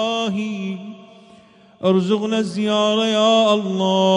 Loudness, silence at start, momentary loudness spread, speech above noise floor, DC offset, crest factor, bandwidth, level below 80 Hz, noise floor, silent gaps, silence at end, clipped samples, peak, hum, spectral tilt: -18 LUFS; 0 s; 12 LU; 31 dB; under 0.1%; 14 dB; 10.5 kHz; -68 dBFS; -48 dBFS; none; 0 s; under 0.1%; -4 dBFS; none; -5.5 dB/octave